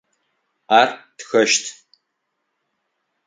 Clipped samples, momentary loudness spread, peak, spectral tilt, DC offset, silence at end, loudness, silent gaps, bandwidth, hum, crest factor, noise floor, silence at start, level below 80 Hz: under 0.1%; 16 LU; 0 dBFS; -1.5 dB/octave; under 0.1%; 1.55 s; -17 LUFS; none; 9.6 kHz; none; 22 dB; -75 dBFS; 0.7 s; -72 dBFS